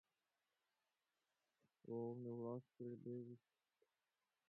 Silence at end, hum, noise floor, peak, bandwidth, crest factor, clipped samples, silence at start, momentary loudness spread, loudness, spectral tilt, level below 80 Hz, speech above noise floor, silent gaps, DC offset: 1.1 s; none; under -90 dBFS; -38 dBFS; 4.2 kHz; 18 dB; under 0.1%; 1.85 s; 12 LU; -52 LUFS; -11 dB/octave; under -90 dBFS; over 39 dB; none; under 0.1%